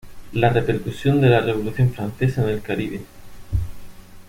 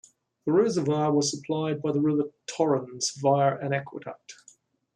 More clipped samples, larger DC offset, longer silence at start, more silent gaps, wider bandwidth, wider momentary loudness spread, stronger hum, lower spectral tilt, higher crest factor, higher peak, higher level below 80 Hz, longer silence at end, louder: neither; neither; second, 0.05 s vs 0.45 s; neither; first, 16 kHz vs 10.5 kHz; about the same, 13 LU vs 12 LU; neither; first, -8 dB/octave vs -5 dB/octave; about the same, 18 dB vs 16 dB; first, -2 dBFS vs -10 dBFS; first, -38 dBFS vs -72 dBFS; second, 0.05 s vs 0.65 s; first, -21 LUFS vs -26 LUFS